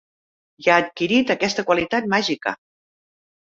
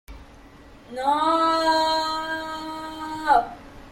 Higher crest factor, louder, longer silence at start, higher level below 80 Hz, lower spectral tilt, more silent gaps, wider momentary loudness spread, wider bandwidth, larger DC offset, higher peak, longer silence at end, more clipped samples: about the same, 20 dB vs 18 dB; first, -20 LUFS vs -23 LUFS; first, 0.6 s vs 0.1 s; second, -60 dBFS vs -50 dBFS; about the same, -4 dB/octave vs -3 dB/octave; neither; second, 8 LU vs 14 LU; second, 7.8 kHz vs 16.5 kHz; neither; first, -2 dBFS vs -6 dBFS; first, 0.95 s vs 0 s; neither